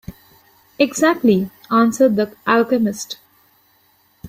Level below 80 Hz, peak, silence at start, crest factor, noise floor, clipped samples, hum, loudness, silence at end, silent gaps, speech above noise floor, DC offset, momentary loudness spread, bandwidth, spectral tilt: -54 dBFS; -2 dBFS; 0.1 s; 18 dB; -58 dBFS; under 0.1%; none; -17 LUFS; 0 s; none; 41 dB; under 0.1%; 10 LU; 16 kHz; -5 dB/octave